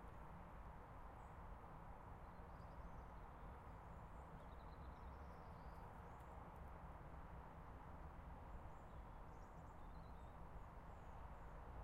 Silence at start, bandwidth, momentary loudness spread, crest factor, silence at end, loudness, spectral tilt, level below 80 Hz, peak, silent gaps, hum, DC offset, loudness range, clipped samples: 0 s; 15 kHz; 1 LU; 12 dB; 0 s; -59 LUFS; -7.5 dB/octave; -60 dBFS; -44 dBFS; none; none; under 0.1%; 1 LU; under 0.1%